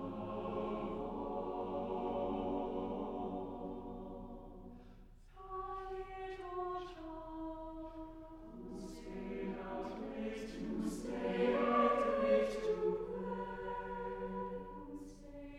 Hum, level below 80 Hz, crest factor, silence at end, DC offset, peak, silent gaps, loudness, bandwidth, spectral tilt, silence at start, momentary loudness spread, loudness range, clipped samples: none; -56 dBFS; 20 dB; 0 s; under 0.1%; -20 dBFS; none; -40 LUFS; 13.5 kHz; -6.5 dB/octave; 0 s; 17 LU; 11 LU; under 0.1%